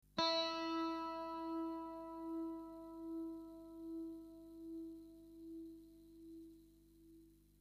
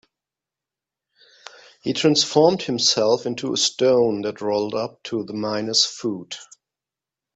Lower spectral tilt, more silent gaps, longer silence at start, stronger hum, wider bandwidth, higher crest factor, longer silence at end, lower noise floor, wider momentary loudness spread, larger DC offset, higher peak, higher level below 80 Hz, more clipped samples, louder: about the same, -4 dB/octave vs -3.5 dB/octave; neither; second, 0.15 s vs 1.85 s; first, 50 Hz at -70 dBFS vs none; first, 15 kHz vs 8.4 kHz; about the same, 24 dB vs 22 dB; second, 0.1 s vs 0.9 s; second, -66 dBFS vs -88 dBFS; first, 21 LU vs 12 LU; neither; second, -22 dBFS vs -2 dBFS; second, -72 dBFS vs -66 dBFS; neither; second, -45 LUFS vs -20 LUFS